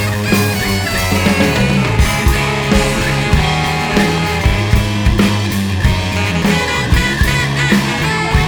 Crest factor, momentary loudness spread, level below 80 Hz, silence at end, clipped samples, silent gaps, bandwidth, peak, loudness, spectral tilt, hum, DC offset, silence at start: 14 dB; 2 LU; -20 dBFS; 0 s; under 0.1%; none; over 20 kHz; 0 dBFS; -14 LUFS; -5 dB/octave; none; under 0.1%; 0 s